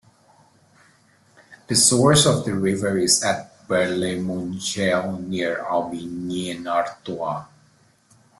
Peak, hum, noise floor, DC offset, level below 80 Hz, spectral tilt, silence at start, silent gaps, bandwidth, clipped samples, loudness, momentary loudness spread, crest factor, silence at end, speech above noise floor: -2 dBFS; none; -58 dBFS; under 0.1%; -56 dBFS; -3.5 dB/octave; 1.5 s; none; 12.5 kHz; under 0.1%; -21 LUFS; 14 LU; 20 dB; 0.95 s; 36 dB